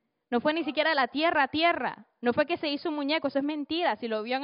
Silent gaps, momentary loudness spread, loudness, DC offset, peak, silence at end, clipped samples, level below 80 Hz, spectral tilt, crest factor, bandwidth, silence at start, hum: none; 7 LU; -28 LUFS; under 0.1%; -12 dBFS; 0 s; under 0.1%; -70 dBFS; -1 dB/octave; 16 dB; 5.4 kHz; 0.3 s; none